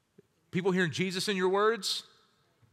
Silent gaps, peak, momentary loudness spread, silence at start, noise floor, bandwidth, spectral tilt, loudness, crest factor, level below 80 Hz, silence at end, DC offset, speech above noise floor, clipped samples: none; -16 dBFS; 7 LU; 0.55 s; -67 dBFS; 15 kHz; -4.5 dB/octave; -30 LUFS; 16 dB; -78 dBFS; 0.7 s; under 0.1%; 38 dB; under 0.1%